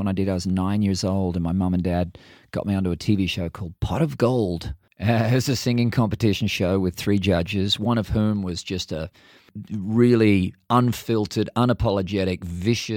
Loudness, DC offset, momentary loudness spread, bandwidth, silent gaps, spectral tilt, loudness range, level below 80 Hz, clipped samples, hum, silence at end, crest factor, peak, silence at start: -23 LUFS; under 0.1%; 10 LU; 18 kHz; none; -6.5 dB/octave; 3 LU; -42 dBFS; under 0.1%; none; 0 s; 18 dB; -4 dBFS; 0 s